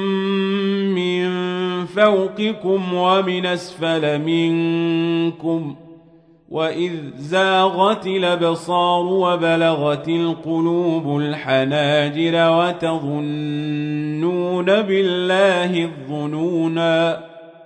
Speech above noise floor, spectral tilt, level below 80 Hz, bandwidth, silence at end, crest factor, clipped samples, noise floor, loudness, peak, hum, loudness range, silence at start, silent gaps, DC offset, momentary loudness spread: 31 dB; -6.5 dB/octave; -66 dBFS; 10 kHz; 0 s; 16 dB; under 0.1%; -50 dBFS; -19 LUFS; -2 dBFS; none; 3 LU; 0 s; none; under 0.1%; 8 LU